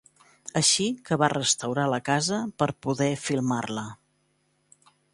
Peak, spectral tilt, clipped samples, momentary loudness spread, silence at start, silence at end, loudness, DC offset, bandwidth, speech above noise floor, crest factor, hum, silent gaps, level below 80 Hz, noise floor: -6 dBFS; -3.5 dB/octave; under 0.1%; 11 LU; 0.55 s; 1.2 s; -25 LUFS; under 0.1%; 11.5 kHz; 44 dB; 22 dB; none; none; -64 dBFS; -70 dBFS